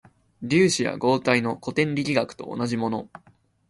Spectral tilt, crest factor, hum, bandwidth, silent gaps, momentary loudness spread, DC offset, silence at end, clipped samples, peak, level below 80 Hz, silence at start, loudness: -5 dB/octave; 18 dB; none; 11.5 kHz; none; 11 LU; under 0.1%; 0.5 s; under 0.1%; -6 dBFS; -60 dBFS; 0.4 s; -24 LUFS